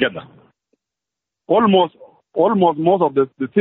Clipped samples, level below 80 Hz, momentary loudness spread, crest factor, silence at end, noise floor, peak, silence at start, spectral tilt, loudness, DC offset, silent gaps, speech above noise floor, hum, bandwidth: under 0.1%; -62 dBFS; 8 LU; 16 dB; 0 s; -84 dBFS; -2 dBFS; 0 s; -4.5 dB/octave; -17 LUFS; under 0.1%; none; 68 dB; none; 4 kHz